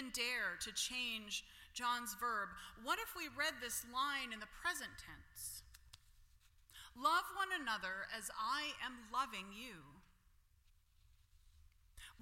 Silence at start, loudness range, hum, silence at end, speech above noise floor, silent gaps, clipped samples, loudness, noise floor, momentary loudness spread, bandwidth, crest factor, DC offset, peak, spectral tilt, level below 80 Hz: 0 s; 5 LU; none; 0 s; 29 dB; none; under 0.1%; -42 LUFS; -72 dBFS; 16 LU; 16.5 kHz; 22 dB; under 0.1%; -24 dBFS; -0.5 dB/octave; -68 dBFS